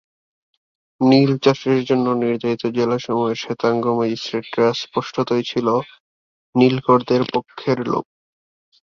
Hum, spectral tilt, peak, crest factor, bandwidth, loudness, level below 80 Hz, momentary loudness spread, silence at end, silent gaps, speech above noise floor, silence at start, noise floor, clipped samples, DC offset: none; -6.5 dB/octave; -2 dBFS; 18 dB; 7.2 kHz; -19 LUFS; -60 dBFS; 9 LU; 0.8 s; 6.00-6.53 s; over 72 dB; 1 s; under -90 dBFS; under 0.1%; under 0.1%